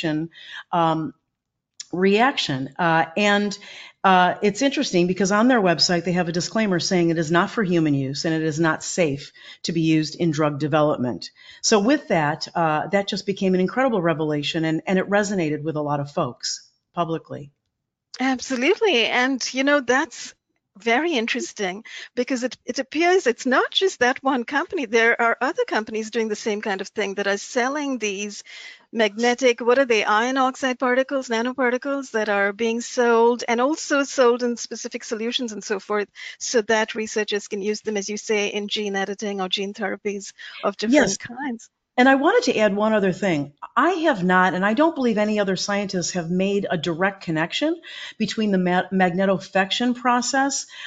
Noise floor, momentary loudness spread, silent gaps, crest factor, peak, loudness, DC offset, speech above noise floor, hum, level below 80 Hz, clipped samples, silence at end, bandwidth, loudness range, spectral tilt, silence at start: -81 dBFS; 10 LU; none; 18 dB; -4 dBFS; -21 LUFS; under 0.1%; 59 dB; none; -62 dBFS; under 0.1%; 0 s; 9.2 kHz; 5 LU; -4.5 dB/octave; 0 s